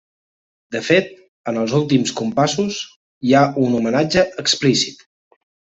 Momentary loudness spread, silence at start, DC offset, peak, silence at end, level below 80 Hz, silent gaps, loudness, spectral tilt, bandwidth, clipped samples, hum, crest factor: 13 LU; 0.7 s; under 0.1%; -2 dBFS; 0.85 s; -54 dBFS; 1.28-1.44 s, 2.96-3.21 s; -18 LUFS; -4.5 dB/octave; 8.4 kHz; under 0.1%; none; 18 dB